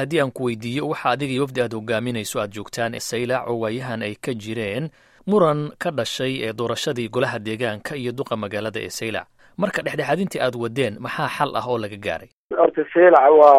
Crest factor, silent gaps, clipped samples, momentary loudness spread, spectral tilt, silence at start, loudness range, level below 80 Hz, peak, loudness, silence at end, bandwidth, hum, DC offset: 20 dB; 12.33-12.50 s; under 0.1%; 10 LU; -5 dB/octave; 0 s; 3 LU; -60 dBFS; 0 dBFS; -22 LUFS; 0 s; 15.5 kHz; none; under 0.1%